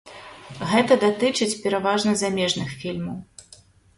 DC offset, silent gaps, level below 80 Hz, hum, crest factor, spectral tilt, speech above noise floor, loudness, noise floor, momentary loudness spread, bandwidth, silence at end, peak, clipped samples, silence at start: under 0.1%; none; -58 dBFS; none; 20 dB; -4 dB/octave; 30 dB; -22 LUFS; -52 dBFS; 19 LU; 11.5 kHz; 0.75 s; -2 dBFS; under 0.1%; 0.05 s